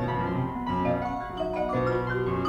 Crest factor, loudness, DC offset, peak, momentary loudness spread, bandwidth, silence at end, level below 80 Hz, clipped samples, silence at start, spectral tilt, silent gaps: 14 dB; -28 LUFS; under 0.1%; -14 dBFS; 4 LU; 9.4 kHz; 0 s; -46 dBFS; under 0.1%; 0 s; -8.5 dB/octave; none